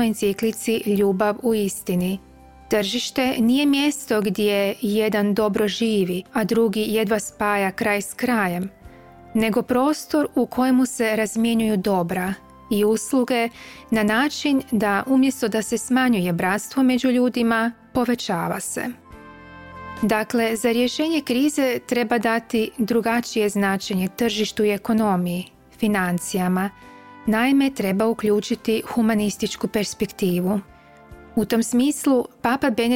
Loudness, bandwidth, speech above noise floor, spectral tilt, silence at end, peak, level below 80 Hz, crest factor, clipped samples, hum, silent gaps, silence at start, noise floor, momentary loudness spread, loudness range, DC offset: -21 LUFS; 17 kHz; 24 dB; -5 dB/octave; 0 s; -6 dBFS; -54 dBFS; 14 dB; under 0.1%; none; none; 0 s; -45 dBFS; 7 LU; 3 LU; under 0.1%